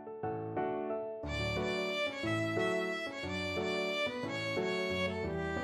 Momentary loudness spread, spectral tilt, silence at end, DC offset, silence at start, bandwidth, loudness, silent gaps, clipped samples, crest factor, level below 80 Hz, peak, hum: 5 LU; -5 dB/octave; 0 s; under 0.1%; 0 s; 13.5 kHz; -35 LUFS; none; under 0.1%; 14 dB; -56 dBFS; -22 dBFS; none